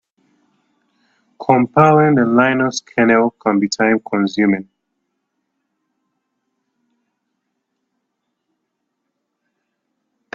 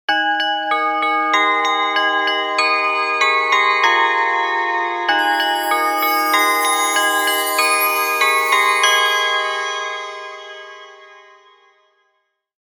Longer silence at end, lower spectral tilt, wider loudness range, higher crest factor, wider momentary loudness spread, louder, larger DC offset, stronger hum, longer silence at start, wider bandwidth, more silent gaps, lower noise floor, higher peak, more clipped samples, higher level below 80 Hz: first, 5.75 s vs 1.45 s; first, -6 dB/octave vs 1.5 dB/octave; first, 10 LU vs 4 LU; about the same, 18 dB vs 16 dB; about the same, 7 LU vs 8 LU; about the same, -15 LUFS vs -15 LUFS; neither; neither; first, 1.4 s vs 0.1 s; second, 7.8 kHz vs 19 kHz; neither; first, -74 dBFS vs -68 dBFS; about the same, 0 dBFS vs 0 dBFS; neither; first, -60 dBFS vs -76 dBFS